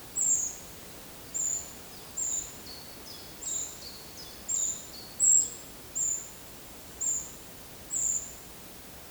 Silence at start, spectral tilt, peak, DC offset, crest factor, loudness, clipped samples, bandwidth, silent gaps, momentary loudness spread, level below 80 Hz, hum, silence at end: 0 s; 0 dB/octave; -12 dBFS; under 0.1%; 22 dB; -28 LUFS; under 0.1%; over 20 kHz; none; 19 LU; -60 dBFS; none; 0 s